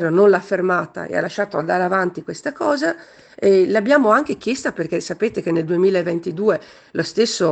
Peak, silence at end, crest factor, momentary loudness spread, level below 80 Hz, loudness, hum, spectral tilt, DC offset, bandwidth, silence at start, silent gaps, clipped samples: -2 dBFS; 0 s; 18 dB; 10 LU; -62 dBFS; -19 LUFS; none; -5.5 dB/octave; under 0.1%; 9 kHz; 0 s; none; under 0.1%